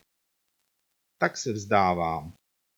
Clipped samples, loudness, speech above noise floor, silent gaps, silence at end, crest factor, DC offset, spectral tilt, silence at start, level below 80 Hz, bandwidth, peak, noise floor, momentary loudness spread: under 0.1%; -27 LUFS; 51 dB; none; 0.45 s; 22 dB; under 0.1%; -5 dB/octave; 1.2 s; -58 dBFS; 19.5 kHz; -8 dBFS; -77 dBFS; 11 LU